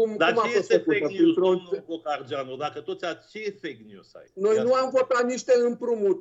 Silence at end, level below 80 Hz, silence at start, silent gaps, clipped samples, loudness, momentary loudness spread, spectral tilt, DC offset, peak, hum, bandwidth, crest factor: 0 s; -78 dBFS; 0 s; none; under 0.1%; -24 LUFS; 12 LU; -5 dB/octave; under 0.1%; -6 dBFS; none; 8 kHz; 18 dB